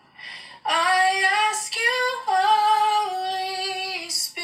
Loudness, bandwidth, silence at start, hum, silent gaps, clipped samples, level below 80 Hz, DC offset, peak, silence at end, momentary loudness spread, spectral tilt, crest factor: -21 LUFS; 15.5 kHz; 0.2 s; none; none; under 0.1%; -80 dBFS; under 0.1%; -8 dBFS; 0 s; 9 LU; 1.5 dB/octave; 16 dB